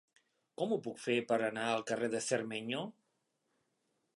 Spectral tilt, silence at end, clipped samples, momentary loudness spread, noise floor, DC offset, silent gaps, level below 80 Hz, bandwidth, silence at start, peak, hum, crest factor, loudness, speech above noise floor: -4 dB/octave; 1.25 s; under 0.1%; 8 LU; -82 dBFS; under 0.1%; none; -86 dBFS; 11.5 kHz; 0.6 s; -18 dBFS; none; 20 dB; -36 LUFS; 46 dB